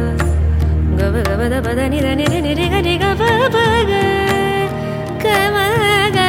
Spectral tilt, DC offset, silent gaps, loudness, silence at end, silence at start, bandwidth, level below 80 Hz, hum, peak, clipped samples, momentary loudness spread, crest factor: -5.5 dB/octave; under 0.1%; none; -15 LUFS; 0 s; 0 s; 16.5 kHz; -22 dBFS; none; 0 dBFS; under 0.1%; 4 LU; 14 dB